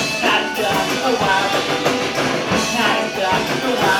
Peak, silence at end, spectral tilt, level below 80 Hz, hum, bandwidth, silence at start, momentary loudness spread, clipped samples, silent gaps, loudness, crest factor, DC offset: -2 dBFS; 0 s; -3 dB/octave; -48 dBFS; none; 18 kHz; 0 s; 3 LU; under 0.1%; none; -17 LUFS; 16 dB; under 0.1%